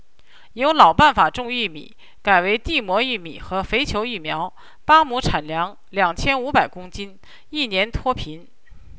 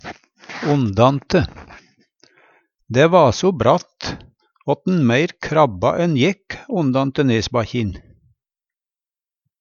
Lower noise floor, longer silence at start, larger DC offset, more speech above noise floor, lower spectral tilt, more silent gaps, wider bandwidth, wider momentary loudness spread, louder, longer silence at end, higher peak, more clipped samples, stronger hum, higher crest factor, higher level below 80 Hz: second, -53 dBFS vs under -90 dBFS; first, 0.55 s vs 0.05 s; first, 1% vs under 0.1%; second, 33 dB vs over 73 dB; second, -4.5 dB/octave vs -6.5 dB/octave; neither; about the same, 8 kHz vs 7.4 kHz; about the same, 17 LU vs 15 LU; about the same, -19 LUFS vs -18 LUFS; second, 0.05 s vs 1.6 s; about the same, 0 dBFS vs 0 dBFS; neither; neither; about the same, 20 dB vs 20 dB; first, -38 dBFS vs -46 dBFS